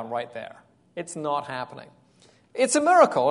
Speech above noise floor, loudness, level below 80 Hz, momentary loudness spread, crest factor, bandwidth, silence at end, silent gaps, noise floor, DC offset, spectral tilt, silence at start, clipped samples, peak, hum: 35 dB; -23 LUFS; -74 dBFS; 21 LU; 22 dB; 11 kHz; 0 s; none; -58 dBFS; under 0.1%; -3.5 dB/octave; 0 s; under 0.1%; -4 dBFS; none